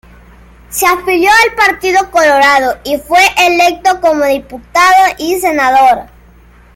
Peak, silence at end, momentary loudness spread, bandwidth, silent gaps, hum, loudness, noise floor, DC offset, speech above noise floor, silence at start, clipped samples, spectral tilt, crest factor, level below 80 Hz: 0 dBFS; 0.75 s; 8 LU; 17 kHz; none; none; -9 LUFS; -40 dBFS; under 0.1%; 31 dB; 0.7 s; under 0.1%; -2 dB/octave; 10 dB; -40 dBFS